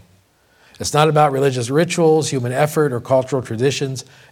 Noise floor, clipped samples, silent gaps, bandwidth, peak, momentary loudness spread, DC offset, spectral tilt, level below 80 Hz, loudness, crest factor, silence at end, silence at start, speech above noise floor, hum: -55 dBFS; under 0.1%; none; 17 kHz; 0 dBFS; 9 LU; under 0.1%; -5 dB/octave; -56 dBFS; -17 LUFS; 18 dB; 0.3 s; 0.8 s; 38 dB; none